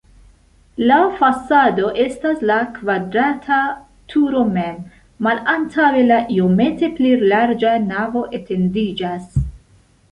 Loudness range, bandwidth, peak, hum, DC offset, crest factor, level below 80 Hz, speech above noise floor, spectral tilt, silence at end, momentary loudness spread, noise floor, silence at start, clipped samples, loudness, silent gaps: 3 LU; 11 kHz; -2 dBFS; none; under 0.1%; 16 dB; -40 dBFS; 36 dB; -7.5 dB/octave; 0.55 s; 10 LU; -52 dBFS; 0.8 s; under 0.1%; -17 LUFS; none